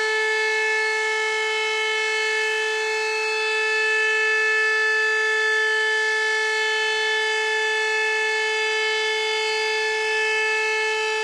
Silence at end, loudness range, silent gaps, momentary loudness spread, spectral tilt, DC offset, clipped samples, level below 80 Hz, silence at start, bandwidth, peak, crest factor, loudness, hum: 0 s; 2 LU; none; 3 LU; 2 dB/octave; under 0.1%; under 0.1%; -72 dBFS; 0 s; 13 kHz; -12 dBFS; 10 dB; -20 LUFS; none